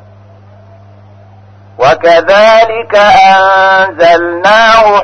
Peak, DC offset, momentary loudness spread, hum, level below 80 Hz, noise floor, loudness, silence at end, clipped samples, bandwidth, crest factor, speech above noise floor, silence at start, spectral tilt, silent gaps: 0 dBFS; under 0.1%; 4 LU; none; -40 dBFS; -36 dBFS; -5 LUFS; 0 s; 1%; 10 kHz; 8 dB; 31 dB; 1.8 s; -3.5 dB/octave; none